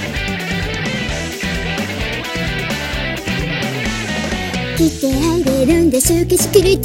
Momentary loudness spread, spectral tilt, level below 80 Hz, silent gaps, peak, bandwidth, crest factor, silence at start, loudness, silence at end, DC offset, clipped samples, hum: 8 LU; -4.5 dB/octave; -30 dBFS; none; 0 dBFS; 17 kHz; 16 dB; 0 s; -17 LUFS; 0 s; under 0.1%; under 0.1%; none